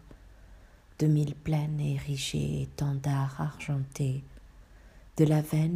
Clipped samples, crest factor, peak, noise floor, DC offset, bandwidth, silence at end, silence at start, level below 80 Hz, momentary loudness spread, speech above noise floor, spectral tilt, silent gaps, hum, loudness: under 0.1%; 20 dB; -12 dBFS; -54 dBFS; under 0.1%; 15.5 kHz; 0 s; 0.1 s; -52 dBFS; 8 LU; 25 dB; -7 dB/octave; none; none; -30 LUFS